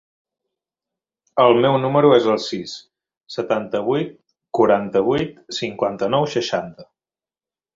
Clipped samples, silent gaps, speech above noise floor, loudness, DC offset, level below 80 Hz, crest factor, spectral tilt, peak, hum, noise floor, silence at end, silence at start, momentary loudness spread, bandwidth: under 0.1%; 3.17-3.21 s; over 72 dB; -19 LUFS; under 0.1%; -58 dBFS; 20 dB; -6 dB/octave; -2 dBFS; none; under -90 dBFS; 0.9 s; 1.35 s; 15 LU; 7.8 kHz